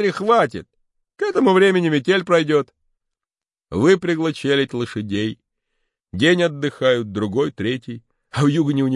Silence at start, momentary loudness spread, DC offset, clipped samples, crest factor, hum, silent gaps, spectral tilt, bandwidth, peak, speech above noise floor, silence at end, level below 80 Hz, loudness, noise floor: 0 s; 13 LU; under 0.1%; under 0.1%; 16 dB; none; none; -6 dB/octave; 11.5 kHz; -4 dBFS; over 72 dB; 0 s; -60 dBFS; -19 LUFS; under -90 dBFS